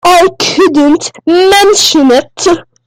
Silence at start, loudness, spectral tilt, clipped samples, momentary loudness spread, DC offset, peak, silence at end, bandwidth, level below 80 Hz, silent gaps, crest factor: 0.05 s; -7 LUFS; -2 dB/octave; 0.3%; 7 LU; under 0.1%; 0 dBFS; 0.25 s; 16.5 kHz; -40 dBFS; none; 8 dB